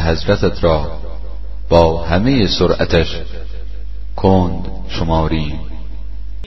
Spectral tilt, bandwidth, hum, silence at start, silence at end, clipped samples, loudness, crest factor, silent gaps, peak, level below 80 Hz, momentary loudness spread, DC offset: -7 dB/octave; 6.2 kHz; none; 0 s; 0 s; under 0.1%; -16 LUFS; 16 dB; none; 0 dBFS; -26 dBFS; 18 LU; 8%